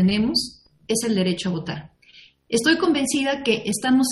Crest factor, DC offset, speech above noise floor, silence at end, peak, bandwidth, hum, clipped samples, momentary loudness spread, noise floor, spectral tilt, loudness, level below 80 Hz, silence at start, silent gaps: 16 dB; under 0.1%; 30 dB; 0 s; -6 dBFS; 12.5 kHz; none; under 0.1%; 10 LU; -51 dBFS; -4 dB/octave; -21 LUFS; -54 dBFS; 0 s; none